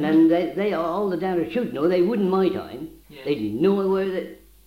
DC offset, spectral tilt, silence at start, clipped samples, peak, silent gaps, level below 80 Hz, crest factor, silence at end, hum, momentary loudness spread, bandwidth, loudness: under 0.1%; -8 dB/octave; 0 s; under 0.1%; -8 dBFS; none; -56 dBFS; 14 dB; 0.3 s; none; 15 LU; 15.5 kHz; -22 LUFS